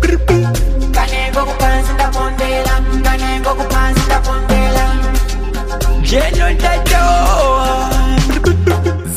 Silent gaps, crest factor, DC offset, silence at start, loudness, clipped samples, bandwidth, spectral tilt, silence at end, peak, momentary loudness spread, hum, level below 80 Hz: none; 12 dB; under 0.1%; 0 s; -14 LUFS; under 0.1%; 15.5 kHz; -5 dB/octave; 0 s; 0 dBFS; 4 LU; none; -14 dBFS